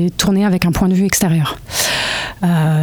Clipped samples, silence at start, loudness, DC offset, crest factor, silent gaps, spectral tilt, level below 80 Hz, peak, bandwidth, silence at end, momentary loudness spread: under 0.1%; 0 s; -15 LUFS; under 0.1%; 14 dB; none; -4.5 dB/octave; -36 dBFS; 0 dBFS; over 20 kHz; 0 s; 4 LU